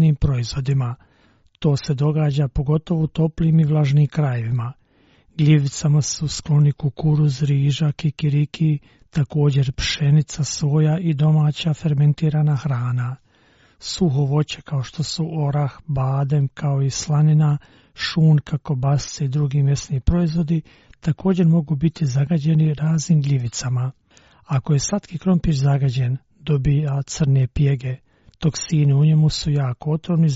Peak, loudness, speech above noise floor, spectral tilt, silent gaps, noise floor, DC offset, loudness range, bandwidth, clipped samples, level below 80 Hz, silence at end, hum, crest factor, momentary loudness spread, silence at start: -4 dBFS; -20 LUFS; 38 dB; -7.5 dB/octave; none; -56 dBFS; under 0.1%; 2 LU; 8 kHz; under 0.1%; -40 dBFS; 0 s; none; 16 dB; 8 LU; 0 s